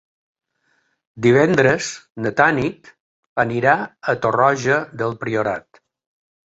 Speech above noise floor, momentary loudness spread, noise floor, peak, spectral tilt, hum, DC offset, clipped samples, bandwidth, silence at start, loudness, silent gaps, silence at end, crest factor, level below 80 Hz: 48 dB; 11 LU; -66 dBFS; -2 dBFS; -5.5 dB/octave; none; under 0.1%; under 0.1%; 8 kHz; 1.15 s; -18 LUFS; 2.10-2.15 s, 3.00-3.36 s; 0.85 s; 18 dB; -54 dBFS